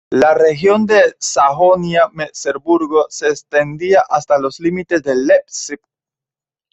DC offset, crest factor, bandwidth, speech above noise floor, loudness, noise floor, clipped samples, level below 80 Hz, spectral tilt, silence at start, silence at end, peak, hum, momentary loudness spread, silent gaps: under 0.1%; 14 dB; 8.4 kHz; 76 dB; -14 LUFS; -90 dBFS; under 0.1%; -56 dBFS; -4.5 dB/octave; 0.1 s; 0.95 s; 0 dBFS; none; 10 LU; none